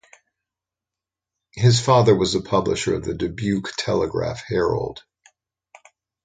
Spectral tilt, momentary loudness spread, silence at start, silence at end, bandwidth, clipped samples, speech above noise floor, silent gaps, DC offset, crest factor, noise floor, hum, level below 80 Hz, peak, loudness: -5.5 dB/octave; 11 LU; 1.55 s; 1.25 s; 9.4 kHz; under 0.1%; 68 dB; none; under 0.1%; 18 dB; -88 dBFS; none; -46 dBFS; -4 dBFS; -21 LUFS